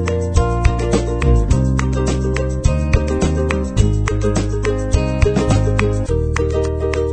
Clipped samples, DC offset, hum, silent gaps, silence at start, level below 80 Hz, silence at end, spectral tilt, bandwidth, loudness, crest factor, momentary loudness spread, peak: under 0.1%; 0.3%; none; none; 0 s; -20 dBFS; 0 s; -6.5 dB/octave; 9.4 kHz; -17 LUFS; 16 dB; 3 LU; 0 dBFS